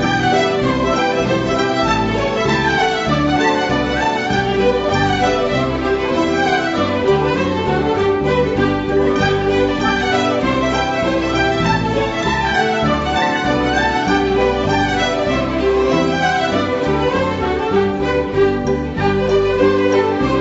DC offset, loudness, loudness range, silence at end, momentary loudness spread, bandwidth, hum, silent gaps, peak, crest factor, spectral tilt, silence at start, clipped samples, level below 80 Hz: under 0.1%; -16 LUFS; 1 LU; 0 s; 2 LU; 8 kHz; none; none; -2 dBFS; 14 dB; -5.5 dB/octave; 0 s; under 0.1%; -34 dBFS